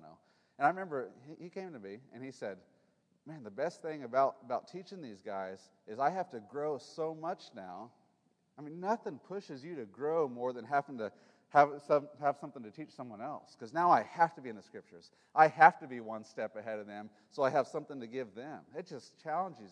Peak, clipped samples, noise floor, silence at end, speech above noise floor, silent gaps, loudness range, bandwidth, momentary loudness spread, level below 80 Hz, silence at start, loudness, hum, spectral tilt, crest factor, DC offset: -8 dBFS; under 0.1%; -75 dBFS; 0.05 s; 40 dB; none; 10 LU; 10 kHz; 20 LU; under -90 dBFS; 0 s; -34 LUFS; none; -6 dB/octave; 28 dB; under 0.1%